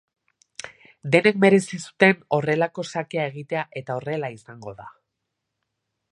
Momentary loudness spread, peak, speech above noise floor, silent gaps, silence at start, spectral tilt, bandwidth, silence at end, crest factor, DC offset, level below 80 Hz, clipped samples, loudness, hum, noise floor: 21 LU; -2 dBFS; 58 dB; none; 0.65 s; -5.5 dB/octave; 11.5 kHz; 1.25 s; 24 dB; under 0.1%; -68 dBFS; under 0.1%; -22 LUFS; none; -80 dBFS